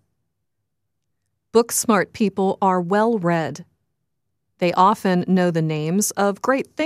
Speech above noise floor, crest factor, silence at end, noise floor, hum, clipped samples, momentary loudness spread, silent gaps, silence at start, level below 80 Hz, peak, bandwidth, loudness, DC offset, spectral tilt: 60 dB; 20 dB; 0 s; -79 dBFS; none; under 0.1%; 6 LU; none; 1.55 s; -66 dBFS; -2 dBFS; 15.5 kHz; -20 LUFS; under 0.1%; -5 dB/octave